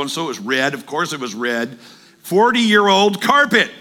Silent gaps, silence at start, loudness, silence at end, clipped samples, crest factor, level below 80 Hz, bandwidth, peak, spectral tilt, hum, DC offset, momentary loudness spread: none; 0 s; -16 LUFS; 0 s; under 0.1%; 16 dB; -64 dBFS; 17.5 kHz; 0 dBFS; -3.5 dB/octave; none; under 0.1%; 10 LU